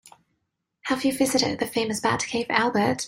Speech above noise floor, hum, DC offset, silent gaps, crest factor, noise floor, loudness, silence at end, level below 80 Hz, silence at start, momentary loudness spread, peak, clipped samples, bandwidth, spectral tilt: 54 dB; none; under 0.1%; none; 22 dB; -78 dBFS; -24 LUFS; 0 s; -60 dBFS; 0.85 s; 4 LU; -4 dBFS; under 0.1%; 16 kHz; -3.5 dB/octave